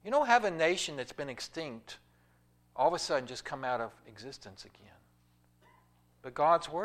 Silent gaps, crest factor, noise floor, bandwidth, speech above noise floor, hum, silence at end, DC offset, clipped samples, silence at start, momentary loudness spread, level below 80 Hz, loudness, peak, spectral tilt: none; 24 dB; -68 dBFS; 15 kHz; 35 dB; 60 Hz at -65 dBFS; 0 s; under 0.1%; under 0.1%; 0.05 s; 24 LU; -68 dBFS; -32 LUFS; -10 dBFS; -3.5 dB/octave